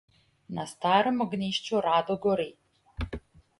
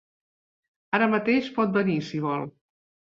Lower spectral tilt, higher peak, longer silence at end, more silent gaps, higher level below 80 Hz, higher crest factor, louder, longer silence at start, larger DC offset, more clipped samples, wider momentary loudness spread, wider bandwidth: second, -5.5 dB/octave vs -7.5 dB/octave; second, -10 dBFS vs -6 dBFS; second, 0.4 s vs 0.55 s; neither; first, -48 dBFS vs -68 dBFS; about the same, 20 dB vs 20 dB; second, -28 LUFS vs -25 LUFS; second, 0.5 s vs 0.9 s; neither; neither; first, 14 LU vs 8 LU; first, 11.5 kHz vs 7.4 kHz